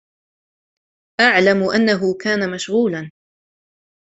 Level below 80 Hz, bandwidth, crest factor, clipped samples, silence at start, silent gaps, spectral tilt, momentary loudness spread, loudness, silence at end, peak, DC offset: -60 dBFS; 8.2 kHz; 18 dB; under 0.1%; 1.2 s; none; -5 dB/octave; 15 LU; -16 LUFS; 1 s; -2 dBFS; under 0.1%